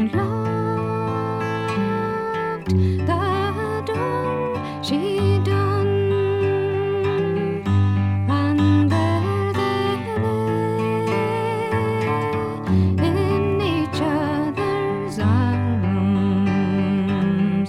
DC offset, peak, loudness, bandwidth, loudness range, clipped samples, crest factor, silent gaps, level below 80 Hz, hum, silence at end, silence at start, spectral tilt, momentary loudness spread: under 0.1%; -8 dBFS; -21 LUFS; 12 kHz; 3 LU; under 0.1%; 14 dB; none; -48 dBFS; none; 0 s; 0 s; -8 dB/octave; 5 LU